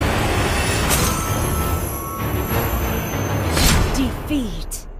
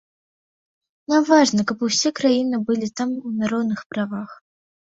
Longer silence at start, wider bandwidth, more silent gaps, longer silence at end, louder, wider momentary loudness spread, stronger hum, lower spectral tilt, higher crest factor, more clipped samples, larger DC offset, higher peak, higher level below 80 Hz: second, 0 s vs 1.1 s; first, 15.5 kHz vs 7.8 kHz; second, none vs 3.86-3.90 s; second, 0 s vs 0.5 s; about the same, -20 LUFS vs -20 LUFS; second, 7 LU vs 12 LU; neither; about the same, -4 dB/octave vs -4 dB/octave; about the same, 18 dB vs 20 dB; neither; neither; about the same, -2 dBFS vs -2 dBFS; first, -26 dBFS vs -64 dBFS